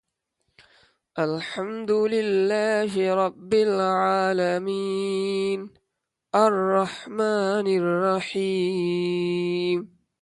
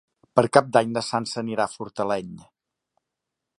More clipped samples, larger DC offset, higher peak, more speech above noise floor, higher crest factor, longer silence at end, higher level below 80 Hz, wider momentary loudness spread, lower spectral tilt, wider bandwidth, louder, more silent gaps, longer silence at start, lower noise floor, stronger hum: neither; neither; second, -6 dBFS vs 0 dBFS; about the same, 58 dB vs 61 dB; second, 18 dB vs 24 dB; second, 0.35 s vs 1.2 s; second, -70 dBFS vs -64 dBFS; second, 7 LU vs 11 LU; about the same, -6 dB/octave vs -5 dB/octave; about the same, 11.5 kHz vs 11.5 kHz; about the same, -24 LUFS vs -23 LUFS; neither; first, 1.15 s vs 0.35 s; about the same, -81 dBFS vs -84 dBFS; neither